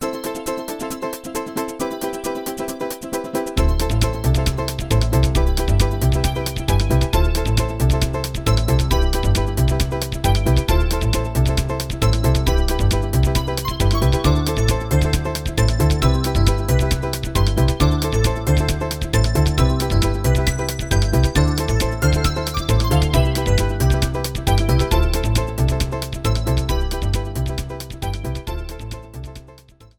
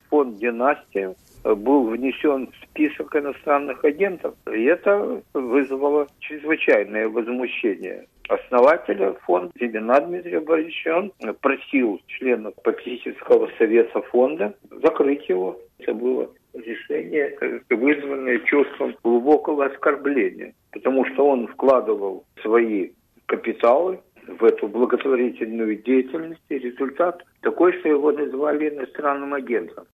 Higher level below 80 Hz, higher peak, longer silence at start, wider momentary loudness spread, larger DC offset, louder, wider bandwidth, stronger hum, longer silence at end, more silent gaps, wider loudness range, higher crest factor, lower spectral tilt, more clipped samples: first, -22 dBFS vs -64 dBFS; about the same, -2 dBFS vs -4 dBFS; about the same, 0 s vs 0.1 s; about the same, 9 LU vs 11 LU; neither; about the same, -20 LUFS vs -22 LUFS; first, 20 kHz vs 13.5 kHz; neither; first, 0.45 s vs 0.15 s; neither; first, 5 LU vs 2 LU; about the same, 16 dB vs 16 dB; second, -5.5 dB/octave vs -7 dB/octave; neither